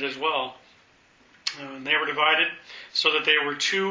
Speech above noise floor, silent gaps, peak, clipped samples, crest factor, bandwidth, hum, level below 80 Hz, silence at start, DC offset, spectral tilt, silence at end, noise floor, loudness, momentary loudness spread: 33 dB; none; -4 dBFS; under 0.1%; 22 dB; 7.6 kHz; none; -74 dBFS; 0 s; under 0.1%; -1.5 dB/octave; 0 s; -58 dBFS; -23 LUFS; 13 LU